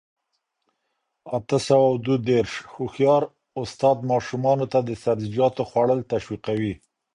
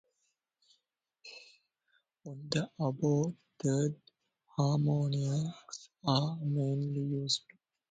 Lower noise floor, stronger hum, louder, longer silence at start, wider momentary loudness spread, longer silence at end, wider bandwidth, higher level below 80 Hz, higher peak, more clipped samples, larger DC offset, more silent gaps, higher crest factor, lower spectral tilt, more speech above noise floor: second, -77 dBFS vs -81 dBFS; neither; first, -23 LUFS vs -33 LUFS; about the same, 1.25 s vs 1.25 s; second, 11 LU vs 20 LU; second, 0.4 s vs 0.55 s; first, 10.5 kHz vs 9.2 kHz; first, -56 dBFS vs -70 dBFS; first, -6 dBFS vs -14 dBFS; neither; neither; neither; about the same, 18 dB vs 22 dB; about the same, -6.5 dB/octave vs -6 dB/octave; first, 55 dB vs 49 dB